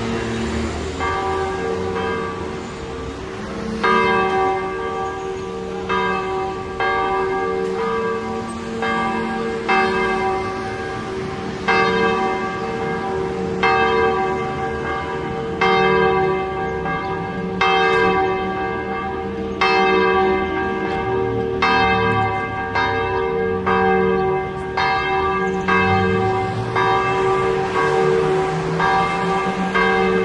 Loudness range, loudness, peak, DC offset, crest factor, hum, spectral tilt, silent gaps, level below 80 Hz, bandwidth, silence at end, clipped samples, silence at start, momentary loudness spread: 4 LU; -19 LUFS; -4 dBFS; under 0.1%; 16 dB; none; -6 dB/octave; none; -42 dBFS; 10.5 kHz; 0 s; under 0.1%; 0 s; 10 LU